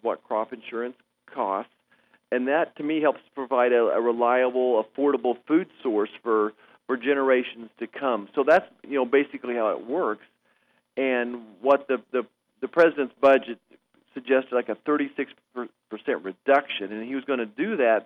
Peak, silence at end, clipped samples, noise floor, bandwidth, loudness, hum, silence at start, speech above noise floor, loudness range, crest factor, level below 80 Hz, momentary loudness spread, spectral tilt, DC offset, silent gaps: -6 dBFS; 0 s; under 0.1%; -67 dBFS; 6.4 kHz; -25 LUFS; none; 0.05 s; 43 dB; 4 LU; 18 dB; -78 dBFS; 15 LU; -6.5 dB/octave; under 0.1%; none